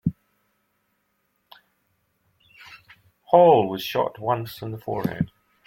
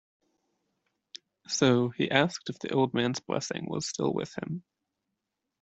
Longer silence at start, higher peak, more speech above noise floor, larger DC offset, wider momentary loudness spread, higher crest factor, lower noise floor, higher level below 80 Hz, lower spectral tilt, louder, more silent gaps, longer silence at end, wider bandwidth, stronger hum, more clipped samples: second, 0.05 s vs 1.5 s; first, -2 dBFS vs -6 dBFS; second, 51 dB vs 56 dB; neither; second, 15 LU vs 18 LU; about the same, 22 dB vs 24 dB; second, -72 dBFS vs -85 dBFS; first, -58 dBFS vs -70 dBFS; first, -7 dB/octave vs -4.5 dB/octave; first, -22 LUFS vs -29 LUFS; neither; second, 0.4 s vs 1 s; first, 16.5 kHz vs 8.2 kHz; neither; neither